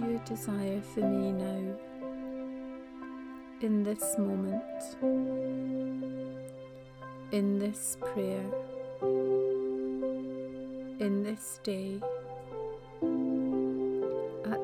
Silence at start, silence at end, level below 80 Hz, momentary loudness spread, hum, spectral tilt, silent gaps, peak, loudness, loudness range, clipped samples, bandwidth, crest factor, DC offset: 0 s; 0 s; -64 dBFS; 12 LU; none; -6 dB/octave; none; -18 dBFS; -34 LUFS; 3 LU; under 0.1%; 18.5 kHz; 16 dB; under 0.1%